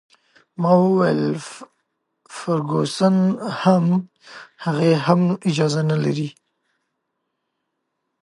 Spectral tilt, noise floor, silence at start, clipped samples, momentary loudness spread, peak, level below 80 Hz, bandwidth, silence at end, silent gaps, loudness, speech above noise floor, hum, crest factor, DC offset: -7 dB/octave; -76 dBFS; 0.6 s; under 0.1%; 14 LU; -2 dBFS; -68 dBFS; 11.5 kHz; 1.9 s; none; -19 LUFS; 57 dB; none; 18 dB; under 0.1%